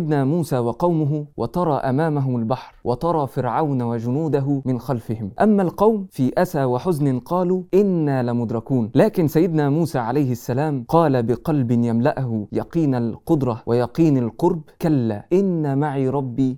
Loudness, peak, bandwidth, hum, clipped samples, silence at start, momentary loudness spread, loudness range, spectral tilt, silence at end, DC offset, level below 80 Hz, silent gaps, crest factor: -20 LUFS; -4 dBFS; 17.5 kHz; none; under 0.1%; 0 s; 6 LU; 2 LU; -8.5 dB/octave; 0 s; under 0.1%; -50 dBFS; none; 16 dB